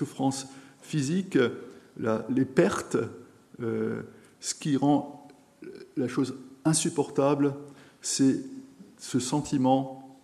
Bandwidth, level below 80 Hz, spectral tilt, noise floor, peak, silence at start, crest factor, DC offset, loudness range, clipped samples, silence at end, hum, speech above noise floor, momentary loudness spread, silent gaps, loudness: 13.5 kHz; -68 dBFS; -5 dB/octave; -48 dBFS; -8 dBFS; 0 s; 20 dB; under 0.1%; 3 LU; under 0.1%; 0.1 s; none; 21 dB; 19 LU; none; -28 LUFS